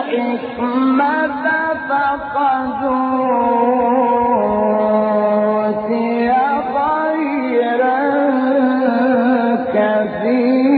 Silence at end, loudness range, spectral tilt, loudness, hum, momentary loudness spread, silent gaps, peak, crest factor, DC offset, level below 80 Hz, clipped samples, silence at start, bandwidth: 0 s; 1 LU; -4.5 dB/octave; -16 LUFS; none; 4 LU; none; -2 dBFS; 12 dB; under 0.1%; -52 dBFS; under 0.1%; 0 s; 4.8 kHz